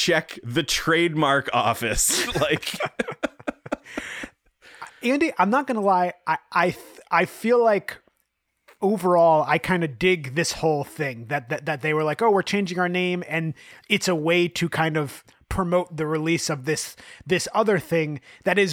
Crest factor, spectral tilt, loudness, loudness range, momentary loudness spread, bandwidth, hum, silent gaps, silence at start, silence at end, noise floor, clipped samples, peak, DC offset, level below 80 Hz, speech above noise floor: 18 dB; -4 dB/octave; -23 LUFS; 3 LU; 12 LU; 19.5 kHz; none; none; 0 s; 0 s; -73 dBFS; under 0.1%; -6 dBFS; under 0.1%; -48 dBFS; 51 dB